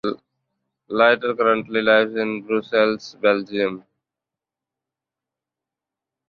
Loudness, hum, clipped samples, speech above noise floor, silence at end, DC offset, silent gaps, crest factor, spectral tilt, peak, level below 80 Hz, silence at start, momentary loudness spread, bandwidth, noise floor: -20 LUFS; none; under 0.1%; 68 dB; 2.5 s; under 0.1%; none; 20 dB; -5.5 dB/octave; -2 dBFS; -66 dBFS; 0.05 s; 11 LU; 7 kHz; -87 dBFS